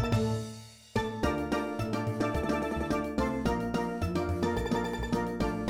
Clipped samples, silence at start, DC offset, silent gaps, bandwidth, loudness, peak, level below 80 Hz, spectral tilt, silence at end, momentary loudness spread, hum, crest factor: under 0.1%; 0 s; under 0.1%; none; 18 kHz; -32 LUFS; -14 dBFS; -44 dBFS; -6.5 dB/octave; 0 s; 4 LU; none; 16 dB